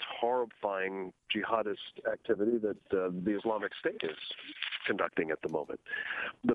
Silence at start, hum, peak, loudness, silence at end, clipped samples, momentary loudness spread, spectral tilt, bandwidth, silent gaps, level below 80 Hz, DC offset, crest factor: 0 s; none; -14 dBFS; -34 LUFS; 0 s; under 0.1%; 7 LU; -7 dB/octave; 6.6 kHz; none; -72 dBFS; under 0.1%; 20 dB